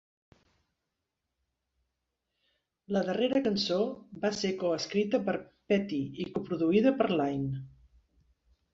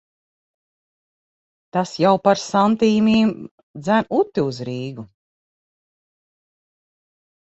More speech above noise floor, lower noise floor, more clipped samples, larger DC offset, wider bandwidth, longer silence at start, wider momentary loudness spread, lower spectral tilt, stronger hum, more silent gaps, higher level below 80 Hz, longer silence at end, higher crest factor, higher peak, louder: second, 56 dB vs over 72 dB; second, -85 dBFS vs under -90 dBFS; neither; neither; about the same, 7.8 kHz vs 8 kHz; first, 2.9 s vs 1.75 s; second, 9 LU vs 15 LU; about the same, -6 dB/octave vs -6 dB/octave; neither; second, none vs 3.51-3.74 s; second, -66 dBFS vs -60 dBFS; second, 1.05 s vs 2.5 s; about the same, 20 dB vs 20 dB; second, -12 dBFS vs -2 dBFS; second, -30 LUFS vs -19 LUFS